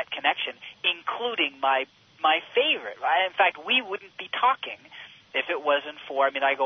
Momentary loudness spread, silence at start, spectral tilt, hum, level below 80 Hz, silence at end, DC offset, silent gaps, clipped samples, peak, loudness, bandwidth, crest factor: 12 LU; 0 s; -3 dB/octave; none; -80 dBFS; 0 s; under 0.1%; none; under 0.1%; -8 dBFS; -25 LUFS; 6.4 kHz; 18 dB